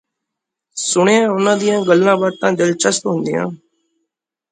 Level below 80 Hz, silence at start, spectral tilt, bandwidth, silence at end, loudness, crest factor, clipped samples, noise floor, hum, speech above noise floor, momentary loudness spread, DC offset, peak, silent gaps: -64 dBFS; 0.75 s; -4 dB/octave; 9.6 kHz; 0.95 s; -15 LUFS; 16 dB; under 0.1%; -80 dBFS; none; 66 dB; 9 LU; under 0.1%; 0 dBFS; none